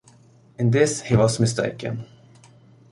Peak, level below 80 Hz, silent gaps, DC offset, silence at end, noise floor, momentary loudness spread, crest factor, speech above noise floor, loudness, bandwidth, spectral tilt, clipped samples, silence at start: -4 dBFS; -52 dBFS; none; under 0.1%; 0.85 s; -52 dBFS; 12 LU; 20 dB; 32 dB; -21 LUFS; 11.5 kHz; -5.5 dB/octave; under 0.1%; 0.6 s